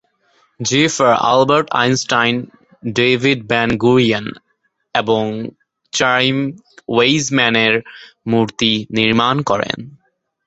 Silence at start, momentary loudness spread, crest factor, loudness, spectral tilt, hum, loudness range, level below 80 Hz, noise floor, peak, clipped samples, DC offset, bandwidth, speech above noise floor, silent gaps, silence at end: 0.6 s; 11 LU; 16 dB; -15 LUFS; -4 dB/octave; none; 3 LU; -52 dBFS; -58 dBFS; 0 dBFS; under 0.1%; under 0.1%; 8.2 kHz; 43 dB; none; 0.5 s